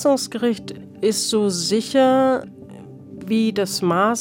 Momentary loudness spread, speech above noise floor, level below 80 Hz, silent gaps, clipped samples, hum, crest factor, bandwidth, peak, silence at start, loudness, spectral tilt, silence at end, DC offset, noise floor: 22 LU; 20 dB; -62 dBFS; none; under 0.1%; none; 14 dB; 17 kHz; -6 dBFS; 0 s; -20 LUFS; -4 dB/octave; 0 s; under 0.1%; -39 dBFS